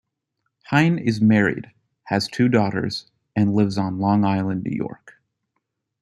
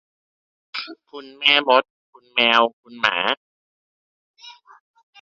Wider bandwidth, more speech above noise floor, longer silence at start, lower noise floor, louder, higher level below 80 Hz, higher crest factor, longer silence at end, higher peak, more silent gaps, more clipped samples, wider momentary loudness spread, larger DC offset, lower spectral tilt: first, 11.5 kHz vs 7.8 kHz; second, 57 dB vs over 70 dB; about the same, 0.7 s vs 0.75 s; second, -77 dBFS vs under -90 dBFS; second, -21 LUFS vs -18 LUFS; first, -58 dBFS vs -72 dBFS; about the same, 18 dB vs 22 dB; first, 0.9 s vs 0.7 s; second, -4 dBFS vs 0 dBFS; second, none vs 1.90-2.13 s, 2.73-2.83 s, 3.37-4.34 s; neither; second, 11 LU vs 18 LU; neither; first, -7 dB/octave vs -2.5 dB/octave